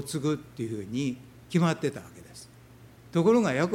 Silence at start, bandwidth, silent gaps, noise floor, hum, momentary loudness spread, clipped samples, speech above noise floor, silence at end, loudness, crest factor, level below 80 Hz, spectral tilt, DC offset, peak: 0 s; 16 kHz; none; -52 dBFS; none; 24 LU; under 0.1%; 24 dB; 0 s; -28 LUFS; 16 dB; -62 dBFS; -6.5 dB/octave; under 0.1%; -12 dBFS